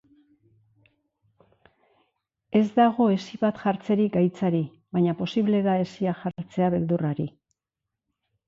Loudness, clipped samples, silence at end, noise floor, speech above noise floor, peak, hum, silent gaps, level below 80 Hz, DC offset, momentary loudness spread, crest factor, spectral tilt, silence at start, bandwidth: -25 LUFS; under 0.1%; 1.2 s; -86 dBFS; 63 dB; -8 dBFS; none; none; -64 dBFS; under 0.1%; 8 LU; 18 dB; -8.5 dB/octave; 2.5 s; 7.4 kHz